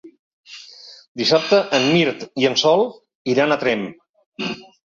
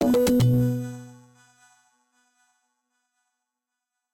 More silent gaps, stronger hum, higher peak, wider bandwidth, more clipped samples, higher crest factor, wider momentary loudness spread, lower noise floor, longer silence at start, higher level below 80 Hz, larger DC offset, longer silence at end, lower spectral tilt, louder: first, 0.19-0.44 s, 1.08-1.15 s, 3.15-3.25 s, 4.09-4.14 s, 4.26-4.32 s vs none; neither; first, -2 dBFS vs -12 dBFS; second, 7.8 kHz vs 16.5 kHz; neither; about the same, 18 dB vs 14 dB; first, 21 LU vs 18 LU; second, -43 dBFS vs -85 dBFS; about the same, 0.05 s vs 0 s; second, -62 dBFS vs -52 dBFS; neither; second, 0.25 s vs 3 s; second, -4.5 dB/octave vs -7 dB/octave; first, -18 LUFS vs -22 LUFS